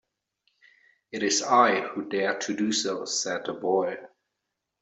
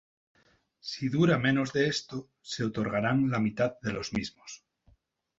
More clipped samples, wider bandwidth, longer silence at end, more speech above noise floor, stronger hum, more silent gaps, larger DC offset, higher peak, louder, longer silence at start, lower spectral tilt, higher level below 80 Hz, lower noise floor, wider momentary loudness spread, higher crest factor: neither; about the same, 8.2 kHz vs 7.8 kHz; about the same, 0.75 s vs 0.85 s; first, 57 dB vs 37 dB; neither; neither; neither; first, -6 dBFS vs -12 dBFS; first, -26 LUFS vs -29 LUFS; first, 1.15 s vs 0.85 s; second, -2.5 dB/octave vs -6 dB/octave; second, -76 dBFS vs -60 dBFS; first, -83 dBFS vs -66 dBFS; second, 10 LU vs 16 LU; about the same, 22 dB vs 18 dB